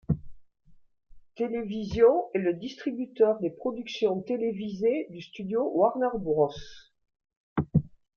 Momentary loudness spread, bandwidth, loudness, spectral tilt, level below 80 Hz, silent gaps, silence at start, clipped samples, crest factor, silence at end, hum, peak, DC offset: 11 LU; 6.8 kHz; -28 LUFS; -8 dB/octave; -54 dBFS; 7.36-7.56 s; 0.1 s; under 0.1%; 20 dB; 0.3 s; none; -10 dBFS; under 0.1%